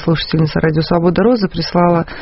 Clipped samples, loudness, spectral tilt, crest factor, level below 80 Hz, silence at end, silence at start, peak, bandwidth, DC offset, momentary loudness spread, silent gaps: under 0.1%; -14 LUFS; -6 dB/octave; 12 dB; -36 dBFS; 0 s; 0 s; 0 dBFS; 6 kHz; under 0.1%; 3 LU; none